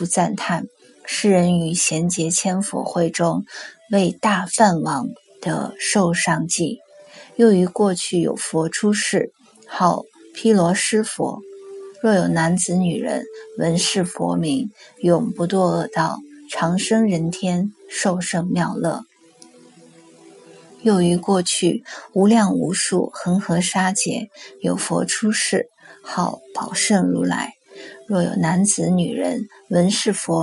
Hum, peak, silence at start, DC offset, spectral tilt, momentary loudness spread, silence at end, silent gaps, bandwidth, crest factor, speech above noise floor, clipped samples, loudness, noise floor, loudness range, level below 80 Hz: none; 0 dBFS; 0 s; under 0.1%; -4.5 dB/octave; 12 LU; 0 s; none; 11.5 kHz; 20 dB; 30 dB; under 0.1%; -20 LUFS; -49 dBFS; 3 LU; -62 dBFS